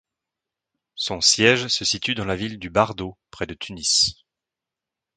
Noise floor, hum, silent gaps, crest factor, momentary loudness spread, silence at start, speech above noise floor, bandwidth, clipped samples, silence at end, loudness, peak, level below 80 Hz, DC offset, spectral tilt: -87 dBFS; none; none; 22 dB; 16 LU; 0.95 s; 65 dB; 11 kHz; under 0.1%; 1.05 s; -20 LUFS; -2 dBFS; -50 dBFS; under 0.1%; -2 dB/octave